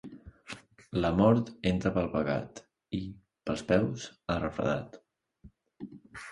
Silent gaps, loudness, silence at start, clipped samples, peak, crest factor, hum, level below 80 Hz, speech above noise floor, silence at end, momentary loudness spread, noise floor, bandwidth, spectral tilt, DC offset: none; -30 LUFS; 0.05 s; under 0.1%; -10 dBFS; 22 dB; none; -52 dBFS; 29 dB; 0 s; 22 LU; -58 dBFS; 11.5 kHz; -7 dB/octave; under 0.1%